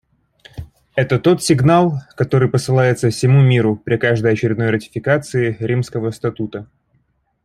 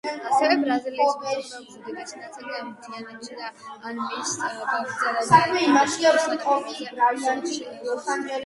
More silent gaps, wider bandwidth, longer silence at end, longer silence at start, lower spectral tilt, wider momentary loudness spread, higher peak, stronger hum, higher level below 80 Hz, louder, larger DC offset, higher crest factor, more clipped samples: neither; first, 13.5 kHz vs 11.5 kHz; first, 0.8 s vs 0 s; first, 0.55 s vs 0.05 s; first, -6.5 dB/octave vs -3.5 dB/octave; second, 13 LU vs 19 LU; about the same, -2 dBFS vs -2 dBFS; neither; first, -48 dBFS vs -68 dBFS; first, -16 LUFS vs -23 LUFS; neither; second, 14 dB vs 22 dB; neither